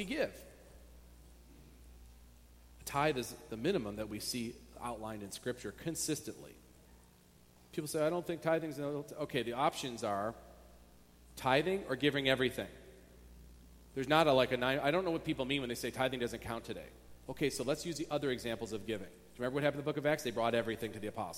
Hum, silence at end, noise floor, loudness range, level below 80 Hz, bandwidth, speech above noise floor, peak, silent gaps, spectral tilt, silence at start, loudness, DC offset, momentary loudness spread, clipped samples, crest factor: 60 Hz at -65 dBFS; 0 s; -63 dBFS; 8 LU; -60 dBFS; 16.5 kHz; 27 dB; -12 dBFS; none; -4.5 dB/octave; 0 s; -36 LUFS; under 0.1%; 14 LU; under 0.1%; 24 dB